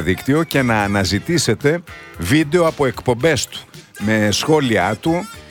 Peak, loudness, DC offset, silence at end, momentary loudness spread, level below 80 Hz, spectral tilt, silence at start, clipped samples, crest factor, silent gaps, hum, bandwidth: -2 dBFS; -17 LUFS; under 0.1%; 0.05 s; 9 LU; -42 dBFS; -5 dB/octave; 0 s; under 0.1%; 16 dB; none; none; 18.5 kHz